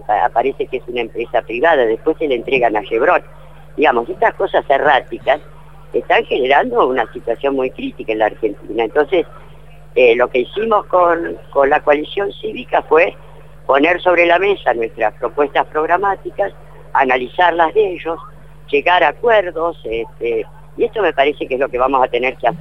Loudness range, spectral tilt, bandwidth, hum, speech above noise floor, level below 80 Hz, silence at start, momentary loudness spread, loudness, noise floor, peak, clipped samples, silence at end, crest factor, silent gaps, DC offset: 2 LU; -6 dB/octave; 6.4 kHz; none; 25 dB; -44 dBFS; 0.1 s; 9 LU; -16 LUFS; -40 dBFS; 0 dBFS; under 0.1%; 0 s; 16 dB; none; 1%